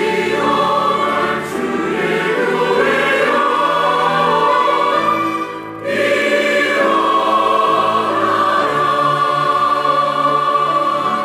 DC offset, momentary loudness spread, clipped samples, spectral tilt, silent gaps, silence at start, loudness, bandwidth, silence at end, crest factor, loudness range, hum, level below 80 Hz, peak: under 0.1%; 4 LU; under 0.1%; -4.5 dB/octave; none; 0 s; -15 LUFS; 15.5 kHz; 0 s; 12 dB; 1 LU; none; -58 dBFS; -4 dBFS